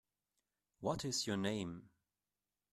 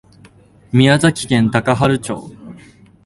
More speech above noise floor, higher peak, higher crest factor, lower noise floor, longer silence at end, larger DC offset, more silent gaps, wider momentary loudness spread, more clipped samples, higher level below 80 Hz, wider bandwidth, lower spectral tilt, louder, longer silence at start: first, over 50 dB vs 32 dB; second, -24 dBFS vs 0 dBFS; about the same, 20 dB vs 16 dB; first, under -90 dBFS vs -46 dBFS; first, 0.85 s vs 0.5 s; neither; neither; second, 9 LU vs 15 LU; neither; second, -70 dBFS vs -46 dBFS; first, 14 kHz vs 11.5 kHz; second, -4 dB/octave vs -5.5 dB/octave; second, -40 LUFS vs -15 LUFS; about the same, 0.8 s vs 0.75 s